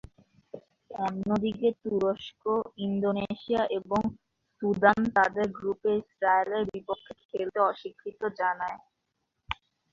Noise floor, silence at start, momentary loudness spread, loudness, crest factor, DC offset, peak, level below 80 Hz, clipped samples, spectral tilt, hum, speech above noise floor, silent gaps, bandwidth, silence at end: -80 dBFS; 0.55 s; 15 LU; -29 LUFS; 24 dB; under 0.1%; -6 dBFS; -60 dBFS; under 0.1%; -7 dB/octave; none; 52 dB; 7.25-7.29 s; 7.6 kHz; 0.4 s